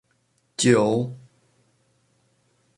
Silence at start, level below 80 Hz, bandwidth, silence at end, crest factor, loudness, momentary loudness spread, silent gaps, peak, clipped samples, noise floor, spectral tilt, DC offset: 0.6 s; -64 dBFS; 11.5 kHz; 1.6 s; 22 dB; -21 LUFS; 21 LU; none; -4 dBFS; under 0.1%; -68 dBFS; -5 dB/octave; under 0.1%